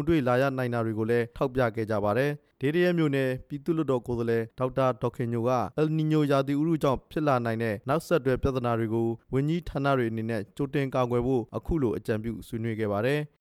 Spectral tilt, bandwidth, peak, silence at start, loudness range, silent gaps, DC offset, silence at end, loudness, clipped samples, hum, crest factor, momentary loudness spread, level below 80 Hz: -8 dB/octave; 16 kHz; -12 dBFS; 0 s; 2 LU; none; under 0.1%; 0.15 s; -28 LUFS; under 0.1%; none; 16 dB; 6 LU; -48 dBFS